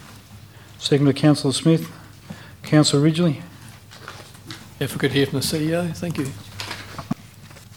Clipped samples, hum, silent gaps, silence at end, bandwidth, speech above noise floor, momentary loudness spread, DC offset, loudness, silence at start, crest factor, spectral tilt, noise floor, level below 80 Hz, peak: under 0.1%; none; none; 0.1 s; 18.5 kHz; 24 dB; 23 LU; under 0.1%; -21 LUFS; 0 s; 20 dB; -5.5 dB/octave; -44 dBFS; -54 dBFS; -2 dBFS